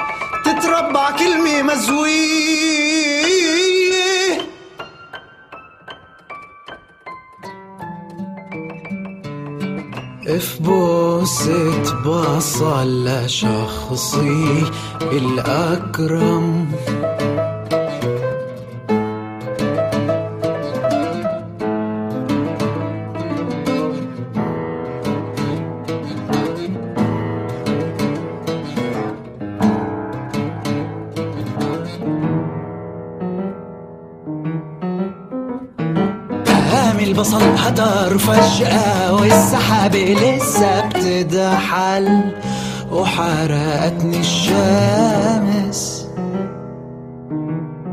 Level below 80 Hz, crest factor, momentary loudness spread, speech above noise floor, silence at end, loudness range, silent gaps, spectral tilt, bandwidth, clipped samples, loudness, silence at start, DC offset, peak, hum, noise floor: -48 dBFS; 18 dB; 16 LU; 25 dB; 0 s; 11 LU; none; -5 dB/octave; 15.5 kHz; under 0.1%; -18 LUFS; 0 s; under 0.1%; 0 dBFS; none; -40 dBFS